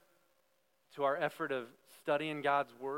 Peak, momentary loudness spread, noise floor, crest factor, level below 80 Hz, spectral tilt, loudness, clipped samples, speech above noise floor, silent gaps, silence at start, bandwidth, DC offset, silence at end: -20 dBFS; 12 LU; -77 dBFS; 18 dB; under -90 dBFS; -5.5 dB/octave; -36 LUFS; under 0.1%; 41 dB; none; 0.95 s; 16.5 kHz; under 0.1%; 0 s